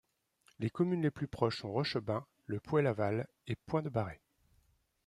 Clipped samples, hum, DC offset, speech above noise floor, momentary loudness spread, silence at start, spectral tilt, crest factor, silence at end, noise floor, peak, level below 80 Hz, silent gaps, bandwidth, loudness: under 0.1%; none; under 0.1%; 39 dB; 11 LU; 0.6 s; -7.5 dB/octave; 22 dB; 0.9 s; -73 dBFS; -14 dBFS; -66 dBFS; none; 12 kHz; -36 LUFS